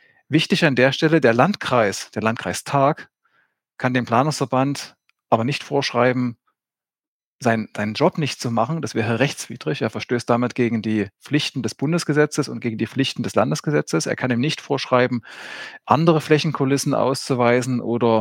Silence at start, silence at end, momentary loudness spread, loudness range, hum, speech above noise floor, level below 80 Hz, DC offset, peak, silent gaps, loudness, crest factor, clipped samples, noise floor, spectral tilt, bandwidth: 0.3 s; 0 s; 8 LU; 3 LU; none; over 70 dB; -66 dBFS; under 0.1%; 0 dBFS; 7.07-7.39 s; -20 LUFS; 20 dB; under 0.1%; under -90 dBFS; -5.5 dB/octave; 17 kHz